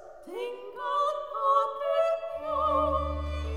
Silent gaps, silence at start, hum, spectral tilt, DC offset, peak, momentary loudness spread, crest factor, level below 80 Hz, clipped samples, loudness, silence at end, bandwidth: none; 0 s; none; -6.5 dB/octave; 0.1%; -12 dBFS; 11 LU; 16 dB; -42 dBFS; under 0.1%; -29 LUFS; 0 s; 14.5 kHz